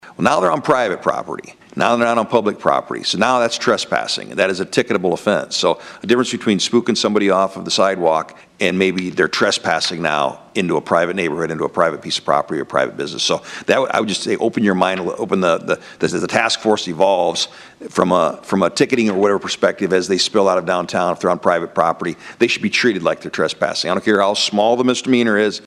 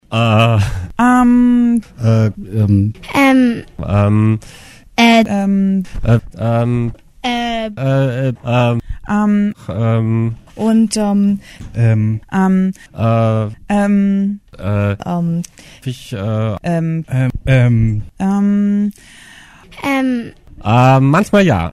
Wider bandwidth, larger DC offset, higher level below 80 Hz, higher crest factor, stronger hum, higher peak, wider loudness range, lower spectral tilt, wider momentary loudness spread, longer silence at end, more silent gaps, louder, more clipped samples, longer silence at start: about the same, 13 kHz vs 13 kHz; neither; second, -60 dBFS vs -34 dBFS; about the same, 18 dB vs 14 dB; neither; about the same, 0 dBFS vs 0 dBFS; about the same, 2 LU vs 4 LU; second, -4 dB/octave vs -7 dB/octave; second, 6 LU vs 11 LU; about the same, 0.05 s vs 0 s; neither; about the same, -17 LUFS vs -15 LUFS; neither; about the same, 0.05 s vs 0.1 s